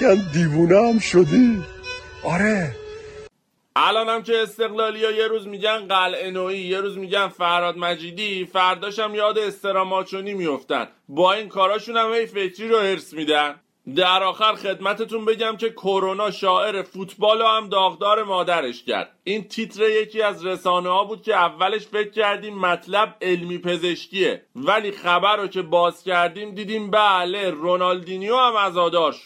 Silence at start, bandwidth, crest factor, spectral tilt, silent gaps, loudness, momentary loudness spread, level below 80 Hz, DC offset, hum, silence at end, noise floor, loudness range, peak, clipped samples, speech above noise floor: 0 s; 14.5 kHz; 18 dB; -5 dB/octave; none; -21 LUFS; 9 LU; -56 dBFS; under 0.1%; none; 0.05 s; -53 dBFS; 2 LU; -4 dBFS; under 0.1%; 32 dB